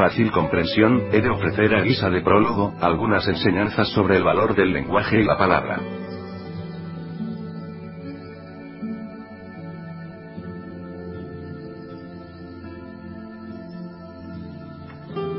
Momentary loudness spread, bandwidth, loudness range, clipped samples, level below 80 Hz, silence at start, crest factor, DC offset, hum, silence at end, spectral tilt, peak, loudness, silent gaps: 20 LU; 5.8 kHz; 17 LU; under 0.1%; -44 dBFS; 0 s; 22 dB; under 0.1%; none; 0 s; -11 dB/octave; 0 dBFS; -20 LUFS; none